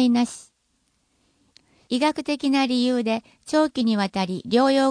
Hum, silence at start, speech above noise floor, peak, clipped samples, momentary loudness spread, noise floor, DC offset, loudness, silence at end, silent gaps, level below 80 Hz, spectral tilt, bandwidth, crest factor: none; 0 s; 48 dB; -6 dBFS; under 0.1%; 8 LU; -69 dBFS; under 0.1%; -22 LUFS; 0 s; none; -66 dBFS; -5 dB/octave; 10.5 kHz; 16 dB